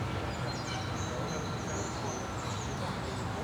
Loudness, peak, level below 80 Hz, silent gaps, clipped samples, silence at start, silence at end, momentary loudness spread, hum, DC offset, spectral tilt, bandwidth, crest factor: -36 LUFS; -22 dBFS; -50 dBFS; none; under 0.1%; 0 s; 0 s; 1 LU; none; under 0.1%; -4.5 dB/octave; over 20 kHz; 12 dB